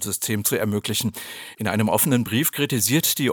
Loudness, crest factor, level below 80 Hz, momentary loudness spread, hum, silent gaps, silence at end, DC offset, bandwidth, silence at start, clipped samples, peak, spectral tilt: -21 LUFS; 20 dB; -60 dBFS; 10 LU; none; none; 0 s; under 0.1%; over 20 kHz; 0 s; under 0.1%; -4 dBFS; -3.5 dB/octave